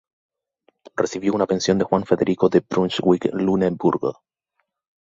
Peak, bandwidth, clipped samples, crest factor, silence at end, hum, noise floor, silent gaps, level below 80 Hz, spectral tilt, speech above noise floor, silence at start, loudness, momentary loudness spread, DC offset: -2 dBFS; 7.8 kHz; under 0.1%; 20 dB; 0.95 s; none; -74 dBFS; none; -56 dBFS; -6 dB/octave; 55 dB; 0.95 s; -20 LUFS; 7 LU; under 0.1%